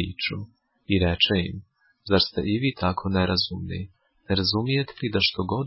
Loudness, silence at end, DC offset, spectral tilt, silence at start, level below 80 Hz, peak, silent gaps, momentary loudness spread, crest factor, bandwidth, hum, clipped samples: -24 LUFS; 0 s; under 0.1%; -9 dB/octave; 0 s; -40 dBFS; -6 dBFS; none; 14 LU; 18 dB; 5.8 kHz; none; under 0.1%